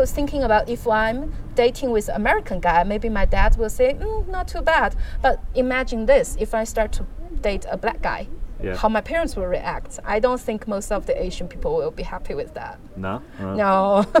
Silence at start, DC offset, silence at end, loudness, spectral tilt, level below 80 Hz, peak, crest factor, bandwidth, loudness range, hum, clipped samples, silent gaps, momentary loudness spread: 0 s; under 0.1%; 0 s; -22 LUFS; -5.5 dB/octave; -28 dBFS; -4 dBFS; 18 dB; 15 kHz; 5 LU; none; under 0.1%; none; 11 LU